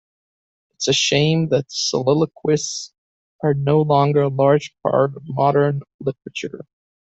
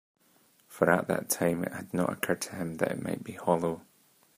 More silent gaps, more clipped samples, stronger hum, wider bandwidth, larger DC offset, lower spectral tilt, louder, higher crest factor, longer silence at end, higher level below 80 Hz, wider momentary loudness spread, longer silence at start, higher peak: first, 2.98-3.39 s, 5.94-5.99 s vs none; neither; neither; second, 8.2 kHz vs 15.5 kHz; neither; about the same, -5 dB/octave vs -5 dB/octave; first, -19 LUFS vs -30 LUFS; second, 16 dB vs 24 dB; about the same, 0.45 s vs 0.55 s; first, -58 dBFS vs -70 dBFS; first, 13 LU vs 9 LU; about the same, 0.8 s vs 0.7 s; first, -4 dBFS vs -8 dBFS